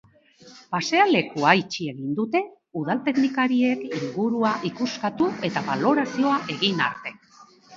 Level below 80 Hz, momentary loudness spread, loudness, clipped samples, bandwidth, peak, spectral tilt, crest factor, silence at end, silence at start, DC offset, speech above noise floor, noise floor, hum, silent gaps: -68 dBFS; 10 LU; -23 LUFS; under 0.1%; 7.6 kHz; -2 dBFS; -5 dB/octave; 22 dB; 0 s; 0.45 s; under 0.1%; 29 dB; -52 dBFS; none; none